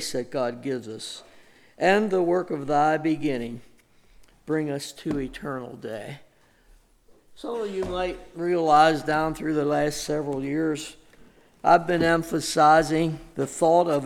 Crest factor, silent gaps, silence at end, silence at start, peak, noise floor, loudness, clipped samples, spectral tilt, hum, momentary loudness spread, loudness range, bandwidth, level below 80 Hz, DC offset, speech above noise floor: 18 dB; none; 0 s; 0 s; -6 dBFS; -57 dBFS; -24 LUFS; under 0.1%; -5 dB/octave; none; 16 LU; 10 LU; 16 kHz; -52 dBFS; under 0.1%; 33 dB